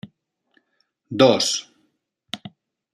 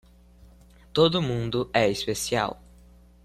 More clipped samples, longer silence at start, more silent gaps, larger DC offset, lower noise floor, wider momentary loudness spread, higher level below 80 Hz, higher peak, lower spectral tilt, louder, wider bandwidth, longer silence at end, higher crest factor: neither; second, 0.05 s vs 0.95 s; neither; neither; first, -71 dBFS vs -53 dBFS; first, 19 LU vs 9 LU; second, -70 dBFS vs -50 dBFS; first, -2 dBFS vs -8 dBFS; about the same, -3.5 dB/octave vs -4.5 dB/octave; first, -18 LUFS vs -25 LUFS; about the same, 14 kHz vs 14 kHz; second, 0.45 s vs 0.7 s; about the same, 22 dB vs 20 dB